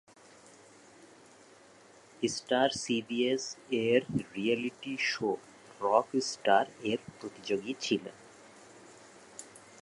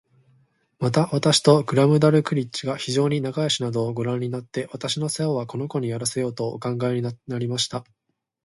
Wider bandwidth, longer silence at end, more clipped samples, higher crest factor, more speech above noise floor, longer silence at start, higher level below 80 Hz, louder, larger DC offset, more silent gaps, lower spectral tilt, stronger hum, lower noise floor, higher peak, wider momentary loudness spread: about the same, 11.5 kHz vs 11.5 kHz; second, 0.2 s vs 0.65 s; neither; about the same, 24 dB vs 22 dB; second, 26 dB vs 40 dB; first, 1 s vs 0.8 s; second, -72 dBFS vs -62 dBFS; second, -31 LUFS vs -23 LUFS; neither; neither; second, -4 dB/octave vs -5.5 dB/octave; neither; second, -58 dBFS vs -62 dBFS; second, -10 dBFS vs -2 dBFS; first, 20 LU vs 11 LU